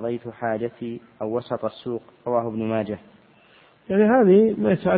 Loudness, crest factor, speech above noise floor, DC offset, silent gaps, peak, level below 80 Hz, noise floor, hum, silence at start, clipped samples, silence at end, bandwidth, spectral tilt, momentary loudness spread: -22 LUFS; 16 dB; 33 dB; under 0.1%; none; -6 dBFS; -58 dBFS; -55 dBFS; none; 0 s; under 0.1%; 0 s; 4.7 kHz; -12 dB/octave; 16 LU